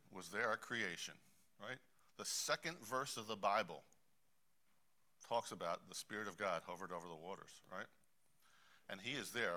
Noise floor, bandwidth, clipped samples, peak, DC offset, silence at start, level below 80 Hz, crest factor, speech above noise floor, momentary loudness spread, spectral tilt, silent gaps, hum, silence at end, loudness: -84 dBFS; 16 kHz; under 0.1%; -24 dBFS; under 0.1%; 0.1 s; -84 dBFS; 24 dB; 39 dB; 14 LU; -2 dB/octave; none; none; 0 s; -45 LUFS